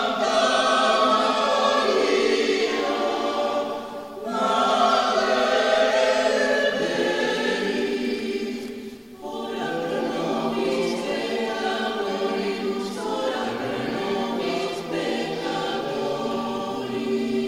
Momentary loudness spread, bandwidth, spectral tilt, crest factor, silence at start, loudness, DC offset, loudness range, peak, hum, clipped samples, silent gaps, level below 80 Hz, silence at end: 9 LU; 16 kHz; -3.5 dB/octave; 18 dB; 0 s; -23 LUFS; under 0.1%; 6 LU; -6 dBFS; none; under 0.1%; none; -60 dBFS; 0 s